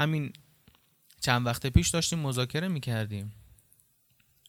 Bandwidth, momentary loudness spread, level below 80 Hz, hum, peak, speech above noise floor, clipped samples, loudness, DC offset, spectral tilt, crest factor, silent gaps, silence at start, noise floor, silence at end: 18.5 kHz; 12 LU; -44 dBFS; none; -6 dBFS; 39 dB; under 0.1%; -29 LUFS; under 0.1%; -4.5 dB/octave; 24 dB; none; 0 s; -67 dBFS; 1.15 s